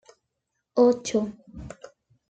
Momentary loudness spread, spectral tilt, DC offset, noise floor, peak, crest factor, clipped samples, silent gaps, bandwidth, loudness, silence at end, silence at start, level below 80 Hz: 23 LU; -5 dB/octave; under 0.1%; -80 dBFS; -8 dBFS; 20 dB; under 0.1%; none; 9 kHz; -24 LUFS; 0.6 s; 0.75 s; -56 dBFS